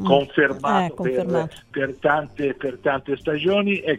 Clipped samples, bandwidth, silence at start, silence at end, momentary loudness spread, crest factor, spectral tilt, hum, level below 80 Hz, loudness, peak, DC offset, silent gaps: under 0.1%; 11 kHz; 0 s; 0 s; 7 LU; 20 dB; -6.5 dB/octave; none; -54 dBFS; -22 LUFS; -2 dBFS; under 0.1%; none